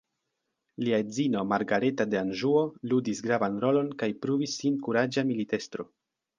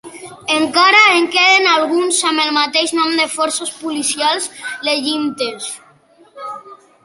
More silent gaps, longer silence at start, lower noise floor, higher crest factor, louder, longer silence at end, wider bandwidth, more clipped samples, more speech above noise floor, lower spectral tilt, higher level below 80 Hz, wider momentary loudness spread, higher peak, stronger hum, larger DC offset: neither; first, 0.8 s vs 0.05 s; first, -82 dBFS vs -49 dBFS; about the same, 18 dB vs 16 dB; second, -28 LUFS vs -14 LUFS; first, 0.55 s vs 0.3 s; second, 9.6 kHz vs 11.5 kHz; neither; first, 54 dB vs 34 dB; first, -5.5 dB/octave vs -0.5 dB/octave; about the same, -70 dBFS vs -66 dBFS; second, 6 LU vs 20 LU; second, -10 dBFS vs 0 dBFS; neither; neither